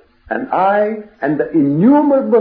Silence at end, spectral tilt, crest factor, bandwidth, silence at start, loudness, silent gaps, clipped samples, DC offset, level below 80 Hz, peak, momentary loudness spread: 0 s; -11.5 dB/octave; 12 dB; 4.7 kHz; 0.3 s; -14 LUFS; none; under 0.1%; under 0.1%; -52 dBFS; -2 dBFS; 11 LU